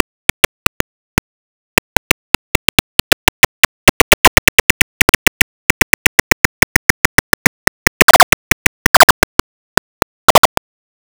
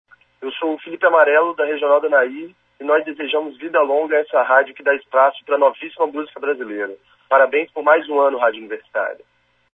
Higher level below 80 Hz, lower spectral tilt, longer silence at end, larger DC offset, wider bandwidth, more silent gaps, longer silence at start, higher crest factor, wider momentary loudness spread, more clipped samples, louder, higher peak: first, -28 dBFS vs -74 dBFS; second, -2.5 dB/octave vs -5 dB/octave; about the same, 0.65 s vs 0.6 s; neither; first, over 20 kHz vs 3.8 kHz; first, 3.89-8.08 s, 8.23-8.94 s, 9.03-10.43 s vs none; first, 3.85 s vs 0.4 s; second, 12 dB vs 18 dB; about the same, 11 LU vs 12 LU; neither; first, -11 LUFS vs -18 LUFS; about the same, 0 dBFS vs 0 dBFS